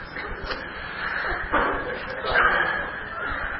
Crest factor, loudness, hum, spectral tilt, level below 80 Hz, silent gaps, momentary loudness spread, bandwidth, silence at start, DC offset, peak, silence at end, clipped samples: 20 dB; -25 LUFS; none; -8.5 dB/octave; -40 dBFS; none; 12 LU; 5.8 kHz; 0 s; under 0.1%; -6 dBFS; 0 s; under 0.1%